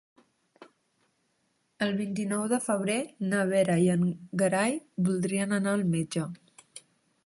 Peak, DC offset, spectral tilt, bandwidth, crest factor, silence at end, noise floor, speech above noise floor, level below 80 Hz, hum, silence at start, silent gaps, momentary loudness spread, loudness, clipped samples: -12 dBFS; under 0.1%; -5.5 dB/octave; 11.5 kHz; 18 dB; 0.45 s; -74 dBFS; 46 dB; -68 dBFS; none; 0.6 s; none; 8 LU; -28 LUFS; under 0.1%